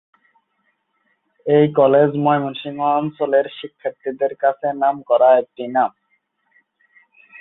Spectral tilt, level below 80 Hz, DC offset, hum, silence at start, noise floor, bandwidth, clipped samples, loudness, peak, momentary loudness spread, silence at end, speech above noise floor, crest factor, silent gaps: -11.5 dB/octave; -68 dBFS; under 0.1%; none; 1.45 s; -68 dBFS; 4 kHz; under 0.1%; -18 LUFS; -2 dBFS; 13 LU; 1.5 s; 51 dB; 18 dB; none